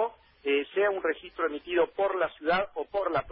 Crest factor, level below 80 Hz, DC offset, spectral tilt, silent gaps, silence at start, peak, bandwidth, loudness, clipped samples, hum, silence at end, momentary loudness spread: 14 dB; -60 dBFS; under 0.1%; -8.5 dB/octave; none; 0 s; -14 dBFS; 5.4 kHz; -29 LUFS; under 0.1%; none; 0 s; 6 LU